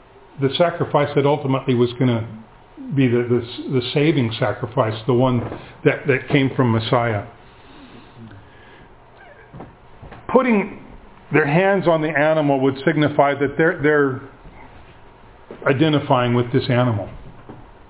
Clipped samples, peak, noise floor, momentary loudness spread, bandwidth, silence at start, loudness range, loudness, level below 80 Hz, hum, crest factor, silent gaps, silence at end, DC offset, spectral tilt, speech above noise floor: under 0.1%; 0 dBFS; -45 dBFS; 9 LU; 4 kHz; 0.35 s; 7 LU; -19 LUFS; -48 dBFS; none; 20 dB; none; 0.25 s; under 0.1%; -11 dB/octave; 27 dB